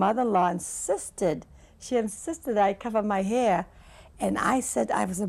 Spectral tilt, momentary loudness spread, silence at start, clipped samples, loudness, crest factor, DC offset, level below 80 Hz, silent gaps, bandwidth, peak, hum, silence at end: -5 dB/octave; 8 LU; 0 s; under 0.1%; -27 LUFS; 16 dB; under 0.1%; -54 dBFS; none; 15.5 kHz; -10 dBFS; none; 0 s